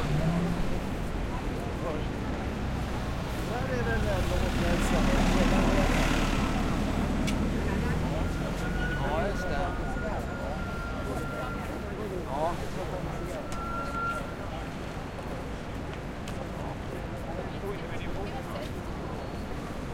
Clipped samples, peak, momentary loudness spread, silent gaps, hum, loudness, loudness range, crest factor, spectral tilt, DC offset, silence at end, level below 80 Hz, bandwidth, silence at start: under 0.1%; -12 dBFS; 10 LU; none; none; -31 LUFS; 9 LU; 18 dB; -6 dB/octave; under 0.1%; 0 s; -36 dBFS; 16.5 kHz; 0 s